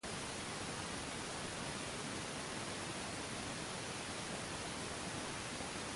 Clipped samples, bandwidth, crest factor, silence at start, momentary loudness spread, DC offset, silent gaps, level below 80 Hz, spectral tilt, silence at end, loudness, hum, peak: under 0.1%; 11.5 kHz; 16 dB; 0.05 s; 0 LU; under 0.1%; none; -62 dBFS; -3 dB/octave; 0 s; -43 LUFS; none; -28 dBFS